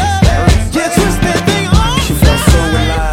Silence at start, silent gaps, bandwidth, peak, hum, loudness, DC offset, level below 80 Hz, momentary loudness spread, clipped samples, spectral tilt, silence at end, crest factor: 0 s; none; 17 kHz; 0 dBFS; none; -11 LUFS; under 0.1%; -14 dBFS; 3 LU; 0.2%; -5 dB/octave; 0 s; 10 dB